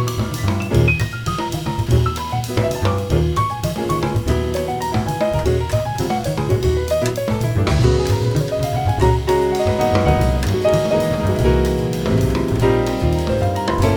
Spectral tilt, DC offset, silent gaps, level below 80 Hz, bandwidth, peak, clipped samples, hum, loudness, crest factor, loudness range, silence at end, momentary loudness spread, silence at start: -6.5 dB/octave; under 0.1%; none; -26 dBFS; over 20 kHz; -2 dBFS; under 0.1%; none; -18 LUFS; 16 dB; 3 LU; 0 s; 5 LU; 0 s